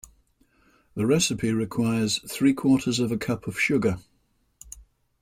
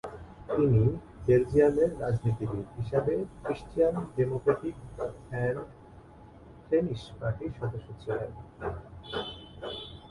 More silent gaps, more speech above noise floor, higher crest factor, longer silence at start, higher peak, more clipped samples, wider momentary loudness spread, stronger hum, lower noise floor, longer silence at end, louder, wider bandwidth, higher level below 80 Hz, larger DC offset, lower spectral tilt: neither; first, 44 dB vs 23 dB; about the same, 16 dB vs 20 dB; first, 0.95 s vs 0.05 s; about the same, -10 dBFS vs -10 dBFS; neither; first, 19 LU vs 15 LU; neither; first, -68 dBFS vs -51 dBFS; first, 0.4 s vs 0 s; first, -24 LUFS vs -30 LUFS; first, 16 kHz vs 11.5 kHz; second, -56 dBFS vs -50 dBFS; neither; second, -4.5 dB/octave vs -8.5 dB/octave